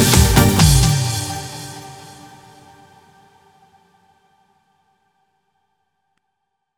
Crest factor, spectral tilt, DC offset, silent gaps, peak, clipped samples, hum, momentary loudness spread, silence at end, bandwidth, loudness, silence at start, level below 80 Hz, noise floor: 20 dB; -4 dB/octave; under 0.1%; none; 0 dBFS; under 0.1%; none; 25 LU; 4.8 s; over 20 kHz; -14 LUFS; 0 s; -28 dBFS; -75 dBFS